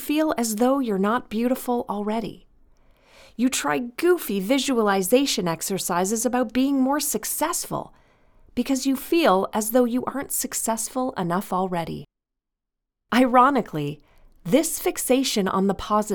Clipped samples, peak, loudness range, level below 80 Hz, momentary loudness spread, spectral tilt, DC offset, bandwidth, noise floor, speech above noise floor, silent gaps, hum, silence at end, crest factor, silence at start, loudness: under 0.1%; -4 dBFS; 4 LU; -52 dBFS; 10 LU; -4 dB/octave; under 0.1%; over 20 kHz; -83 dBFS; 61 dB; none; none; 0 s; 20 dB; 0 s; -23 LUFS